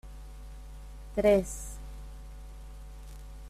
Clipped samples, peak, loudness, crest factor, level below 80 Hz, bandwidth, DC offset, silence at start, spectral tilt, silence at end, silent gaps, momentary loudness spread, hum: under 0.1%; -12 dBFS; -29 LUFS; 22 dB; -44 dBFS; 14.5 kHz; under 0.1%; 0.05 s; -5.5 dB/octave; 0 s; none; 23 LU; none